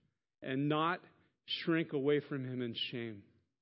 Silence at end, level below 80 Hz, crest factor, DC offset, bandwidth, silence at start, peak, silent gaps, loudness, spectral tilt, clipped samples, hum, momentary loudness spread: 0.4 s; -82 dBFS; 18 dB; under 0.1%; 5.6 kHz; 0.4 s; -20 dBFS; none; -36 LUFS; -4 dB/octave; under 0.1%; none; 11 LU